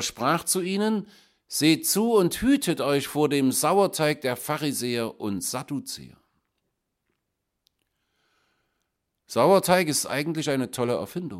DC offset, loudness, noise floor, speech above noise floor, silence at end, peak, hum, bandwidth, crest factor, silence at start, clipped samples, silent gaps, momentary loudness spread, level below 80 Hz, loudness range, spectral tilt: under 0.1%; -24 LUFS; -80 dBFS; 56 dB; 0 s; -6 dBFS; none; 16.5 kHz; 20 dB; 0 s; under 0.1%; none; 10 LU; -58 dBFS; 13 LU; -4 dB/octave